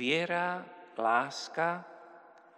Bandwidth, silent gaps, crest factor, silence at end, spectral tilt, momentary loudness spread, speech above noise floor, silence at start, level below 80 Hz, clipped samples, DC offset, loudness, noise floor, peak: 10.5 kHz; none; 20 dB; 0.4 s; -4 dB/octave; 16 LU; 24 dB; 0 s; under -90 dBFS; under 0.1%; under 0.1%; -32 LUFS; -56 dBFS; -14 dBFS